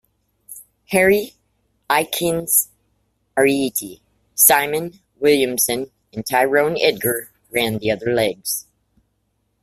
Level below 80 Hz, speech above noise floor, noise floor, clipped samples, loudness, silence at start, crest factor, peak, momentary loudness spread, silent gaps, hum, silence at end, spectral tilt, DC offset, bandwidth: -56 dBFS; 51 dB; -69 dBFS; under 0.1%; -18 LUFS; 0.5 s; 20 dB; 0 dBFS; 16 LU; none; none; 1 s; -2.5 dB/octave; under 0.1%; 16 kHz